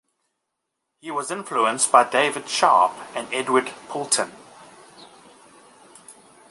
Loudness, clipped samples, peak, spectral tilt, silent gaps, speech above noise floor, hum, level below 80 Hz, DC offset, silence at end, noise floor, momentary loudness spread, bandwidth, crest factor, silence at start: -21 LUFS; under 0.1%; 0 dBFS; -1.5 dB/octave; none; 58 dB; none; -74 dBFS; under 0.1%; 0.4 s; -80 dBFS; 15 LU; 11.5 kHz; 24 dB; 1.05 s